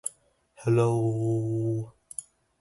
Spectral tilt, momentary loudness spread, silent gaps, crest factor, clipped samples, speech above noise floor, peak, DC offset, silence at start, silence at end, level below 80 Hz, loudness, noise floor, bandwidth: -7.5 dB/octave; 16 LU; none; 16 dB; under 0.1%; 36 dB; -12 dBFS; under 0.1%; 0.05 s; 0.4 s; -60 dBFS; -28 LUFS; -61 dBFS; 12 kHz